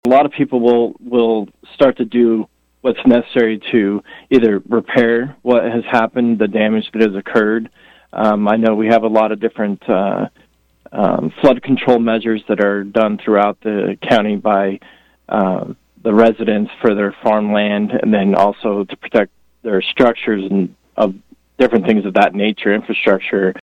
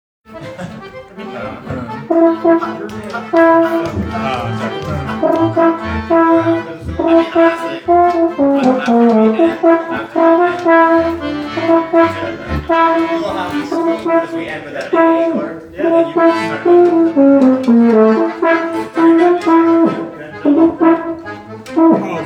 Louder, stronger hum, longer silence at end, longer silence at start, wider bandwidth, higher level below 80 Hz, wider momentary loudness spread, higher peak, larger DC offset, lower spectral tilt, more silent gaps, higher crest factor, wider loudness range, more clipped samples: about the same, -15 LUFS vs -13 LUFS; neither; about the same, 0.1 s vs 0 s; second, 0.05 s vs 0.3 s; second, 7.2 kHz vs 8.6 kHz; second, -54 dBFS vs -42 dBFS; second, 8 LU vs 15 LU; about the same, 0 dBFS vs 0 dBFS; neither; about the same, -7.5 dB/octave vs -7 dB/octave; neither; about the same, 14 dB vs 12 dB; about the same, 2 LU vs 4 LU; neither